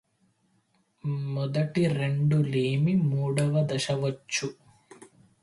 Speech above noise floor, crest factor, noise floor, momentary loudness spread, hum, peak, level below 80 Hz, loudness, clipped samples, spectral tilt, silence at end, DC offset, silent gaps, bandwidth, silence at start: 43 dB; 14 dB; -69 dBFS; 7 LU; none; -14 dBFS; -64 dBFS; -27 LUFS; under 0.1%; -6.5 dB/octave; 0.4 s; under 0.1%; none; 11.5 kHz; 1.05 s